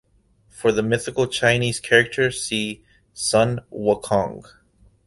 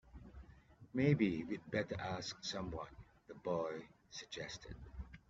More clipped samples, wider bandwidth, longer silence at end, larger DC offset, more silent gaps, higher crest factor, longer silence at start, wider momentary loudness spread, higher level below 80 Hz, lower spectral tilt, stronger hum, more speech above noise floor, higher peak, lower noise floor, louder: neither; first, 12 kHz vs 7.8 kHz; first, 0.65 s vs 0.1 s; neither; neither; about the same, 20 dB vs 22 dB; first, 0.55 s vs 0.05 s; second, 9 LU vs 23 LU; first, -52 dBFS vs -60 dBFS; second, -4 dB/octave vs -5.5 dB/octave; neither; first, 38 dB vs 22 dB; first, -2 dBFS vs -20 dBFS; about the same, -59 dBFS vs -62 dBFS; first, -21 LUFS vs -41 LUFS